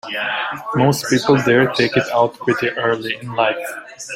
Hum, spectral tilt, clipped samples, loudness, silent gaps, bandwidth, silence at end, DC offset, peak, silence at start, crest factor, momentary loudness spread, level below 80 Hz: none; -5 dB/octave; under 0.1%; -17 LUFS; none; 16 kHz; 0 s; under 0.1%; -2 dBFS; 0.05 s; 16 dB; 9 LU; -56 dBFS